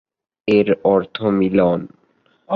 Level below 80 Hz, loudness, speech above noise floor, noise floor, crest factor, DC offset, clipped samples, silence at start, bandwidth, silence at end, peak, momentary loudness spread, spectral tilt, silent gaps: -52 dBFS; -17 LUFS; 43 dB; -59 dBFS; 16 dB; under 0.1%; under 0.1%; 0.45 s; 6.4 kHz; 0 s; -2 dBFS; 10 LU; -9 dB/octave; none